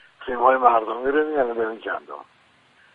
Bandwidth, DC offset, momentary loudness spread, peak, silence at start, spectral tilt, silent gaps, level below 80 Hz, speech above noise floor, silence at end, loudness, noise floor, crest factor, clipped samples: 4.5 kHz; under 0.1%; 15 LU; -2 dBFS; 0.2 s; -6.5 dB/octave; none; -58 dBFS; 36 dB; 0.7 s; -21 LUFS; -57 dBFS; 20 dB; under 0.1%